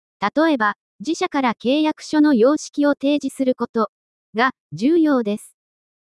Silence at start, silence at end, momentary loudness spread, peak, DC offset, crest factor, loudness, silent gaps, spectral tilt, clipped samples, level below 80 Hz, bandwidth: 0.2 s; 0.75 s; 9 LU; -4 dBFS; under 0.1%; 16 dB; -19 LUFS; 0.76-0.99 s, 3.69-3.74 s, 3.89-4.33 s, 4.60-4.70 s; -5 dB/octave; under 0.1%; -68 dBFS; 12 kHz